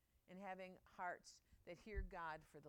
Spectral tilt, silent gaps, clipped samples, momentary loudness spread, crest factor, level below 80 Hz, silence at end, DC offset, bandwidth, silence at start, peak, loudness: -5 dB/octave; none; under 0.1%; 12 LU; 20 dB; -60 dBFS; 0 s; under 0.1%; 16.5 kHz; 0.3 s; -34 dBFS; -54 LUFS